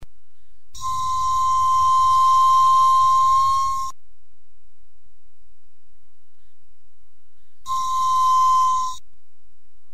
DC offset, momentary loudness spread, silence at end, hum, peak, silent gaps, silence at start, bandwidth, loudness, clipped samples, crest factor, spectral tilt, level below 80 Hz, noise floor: 5%; 13 LU; 0.95 s; none; -10 dBFS; none; 0 s; 14.5 kHz; -18 LUFS; under 0.1%; 10 dB; -0.5 dB/octave; -50 dBFS; -64 dBFS